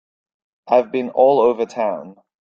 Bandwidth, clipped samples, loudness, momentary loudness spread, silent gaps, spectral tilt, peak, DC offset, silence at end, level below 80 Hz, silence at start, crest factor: 7.4 kHz; under 0.1%; -17 LUFS; 10 LU; none; -6.5 dB/octave; -2 dBFS; under 0.1%; 0.35 s; -66 dBFS; 0.65 s; 16 dB